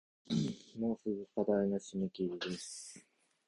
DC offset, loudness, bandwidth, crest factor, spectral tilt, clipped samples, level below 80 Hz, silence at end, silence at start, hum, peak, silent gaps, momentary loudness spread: under 0.1%; -38 LUFS; 11.5 kHz; 18 dB; -5.5 dB/octave; under 0.1%; -70 dBFS; 0.5 s; 0.3 s; none; -20 dBFS; none; 13 LU